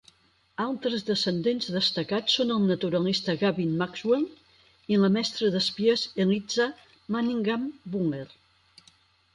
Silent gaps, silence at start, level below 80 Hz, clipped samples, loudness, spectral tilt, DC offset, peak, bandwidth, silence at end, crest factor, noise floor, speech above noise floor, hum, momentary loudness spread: none; 0.6 s; -66 dBFS; under 0.1%; -26 LUFS; -5.5 dB/octave; under 0.1%; -12 dBFS; 11 kHz; 1.05 s; 16 dB; -61 dBFS; 35 dB; none; 9 LU